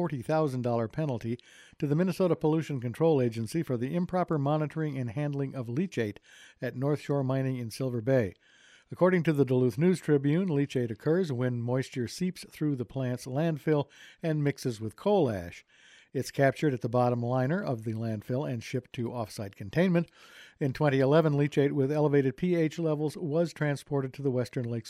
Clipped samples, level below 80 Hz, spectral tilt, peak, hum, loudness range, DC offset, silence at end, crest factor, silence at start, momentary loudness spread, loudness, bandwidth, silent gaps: under 0.1%; -66 dBFS; -7.5 dB/octave; -12 dBFS; none; 4 LU; under 0.1%; 0 s; 18 dB; 0 s; 9 LU; -29 LUFS; 14.5 kHz; none